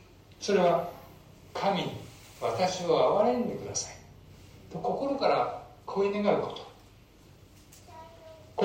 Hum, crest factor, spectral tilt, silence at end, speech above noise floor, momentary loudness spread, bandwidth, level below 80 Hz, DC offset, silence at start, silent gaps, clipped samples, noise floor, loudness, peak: none; 20 dB; -4.5 dB/octave; 0 s; 28 dB; 24 LU; 16 kHz; -62 dBFS; under 0.1%; 0.3 s; none; under 0.1%; -55 dBFS; -29 LUFS; -10 dBFS